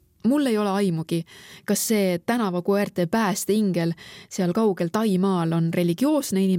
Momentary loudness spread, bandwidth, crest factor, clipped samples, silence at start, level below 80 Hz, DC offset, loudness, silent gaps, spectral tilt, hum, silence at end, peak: 7 LU; 17 kHz; 14 dB; under 0.1%; 0.25 s; -66 dBFS; under 0.1%; -23 LUFS; none; -5.5 dB/octave; none; 0 s; -8 dBFS